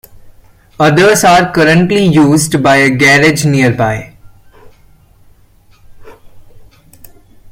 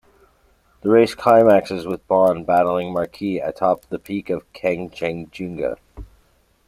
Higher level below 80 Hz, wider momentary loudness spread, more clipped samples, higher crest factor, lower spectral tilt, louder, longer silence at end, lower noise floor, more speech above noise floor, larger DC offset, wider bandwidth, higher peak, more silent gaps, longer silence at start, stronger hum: first, -42 dBFS vs -50 dBFS; second, 6 LU vs 13 LU; neither; second, 12 dB vs 18 dB; second, -5 dB/octave vs -7 dB/octave; first, -8 LUFS vs -19 LUFS; first, 0.85 s vs 0.65 s; second, -45 dBFS vs -59 dBFS; about the same, 37 dB vs 40 dB; neither; about the same, 17 kHz vs 15.5 kHz; about the same, 0 dBFS vs -2 dBFS; neither; second, 0.25 s vs 0.85 s; neither